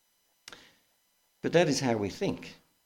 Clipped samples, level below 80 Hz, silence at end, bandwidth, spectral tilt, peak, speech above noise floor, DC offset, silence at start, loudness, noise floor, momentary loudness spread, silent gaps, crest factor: under 0.1%; -64 dBFS; 0.3 s; 16.5 kHz; -5 dB/octave; -12 dBFS; 43 dB; under 0.1%; 1.45 s; -29 LUFS; -72 dBFS; 24 LU; none; 20 dB